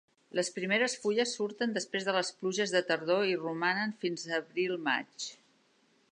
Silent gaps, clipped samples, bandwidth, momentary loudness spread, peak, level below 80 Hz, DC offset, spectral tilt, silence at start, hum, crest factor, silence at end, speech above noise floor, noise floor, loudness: none; under 0.1%; 11 kHz; 6 LU; -14 dBFS; -86 dBFS; under 0.1%; -3.5 dB/octave; 0.35 s; none; 18 dB; 0.75 s; 37 dB; -69 dBFS; -32 LUFS